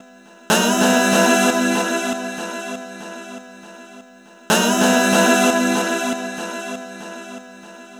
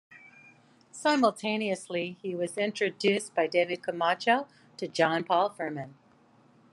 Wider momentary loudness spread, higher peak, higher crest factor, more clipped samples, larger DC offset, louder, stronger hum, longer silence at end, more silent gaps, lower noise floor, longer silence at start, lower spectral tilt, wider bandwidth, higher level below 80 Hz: first, 19 LU vs 11 LU; first, -2 dBFS vs -10 dBFS; about the same, 18 dB vs 20 dB; neither; neither; first, -17 LUFS vs -28 LUFS; neither; second, 0 s vs 0.8 s; neither; second, -45 dBFS vs -61 dBFS; first, 0.5 s vs 0.1 s; second, -3 dB/octave vs -4.5 dB/octave; first, over 20 kHz vs 12.5 kHz; first, -66 dBFS vs -84 dBFS